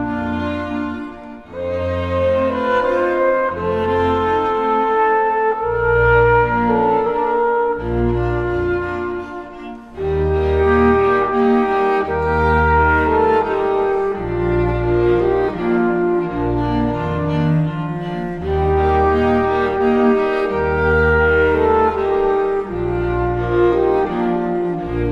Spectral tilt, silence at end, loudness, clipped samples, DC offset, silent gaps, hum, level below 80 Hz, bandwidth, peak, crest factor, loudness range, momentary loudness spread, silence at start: -8.5 dB/octave; 0 s; -17 LUFS; under 0.1%; under 0.1%; none; none; -30 dBFS; 7.4 kHz; -2 dBFS; 14 dB; 4 LU; 9 LU; 0 s